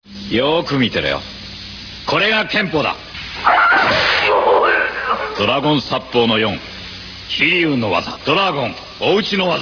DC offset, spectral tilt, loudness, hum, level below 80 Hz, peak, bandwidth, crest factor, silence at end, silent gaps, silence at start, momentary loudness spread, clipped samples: under 0.1%; -5 dB/octave; -15 LUFS; none; -44 dBFS; 0 dBFS; 5.4 kHz; 16 dB; 0 s; none; 0.1 s; 14 LU; under 0.1%